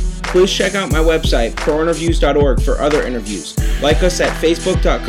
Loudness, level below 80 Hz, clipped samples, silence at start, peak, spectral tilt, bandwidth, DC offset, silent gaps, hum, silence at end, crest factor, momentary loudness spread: -15 LUFS; -20 dBFS; under 0.1%; 0 s; 0 dBFS; -5 dB/octave; 15 kHz; under 0.1%; none; none; 0 s; 14 dB; 5 LU